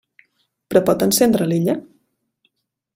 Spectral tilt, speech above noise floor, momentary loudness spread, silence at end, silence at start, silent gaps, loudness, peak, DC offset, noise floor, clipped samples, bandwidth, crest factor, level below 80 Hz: -5 dB/octave; 52 dB; 7 LU; 1.15 s; 0.7 s; none; -17 LUFS; -2 dBFS; under 0.1%; -69 dBFS; under 0.1%; 16.5 kHz; 18 dB; -54 dBFS